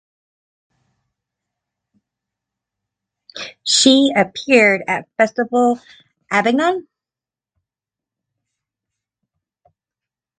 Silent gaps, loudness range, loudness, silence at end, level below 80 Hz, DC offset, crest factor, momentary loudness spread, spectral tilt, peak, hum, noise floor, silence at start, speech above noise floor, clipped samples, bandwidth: none; 8 LU; -15 LUFS; 3.55 s; -66 dBFS; under 0.1%; 20 dB; 15 LU; -2.5 dB/octave; 0 dBFS; none; -90 dBFS; 3.35 s; 74 dB; under 0.1%; 9.4 kHz